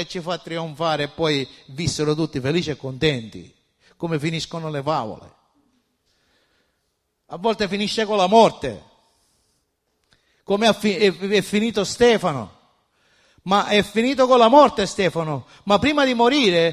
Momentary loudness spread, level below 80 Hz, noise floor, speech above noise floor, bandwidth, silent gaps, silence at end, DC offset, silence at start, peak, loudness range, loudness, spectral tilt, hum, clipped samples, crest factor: 15 LU; -52 dBFS; -72 dBFS; 53 dB; 14.5 kHz; none; 0 s; under 0.1%; 0 s; -2 dBFS; 11 LU; -20 LUFS; -5 dB/octave; none; under 0.1%; 20 dB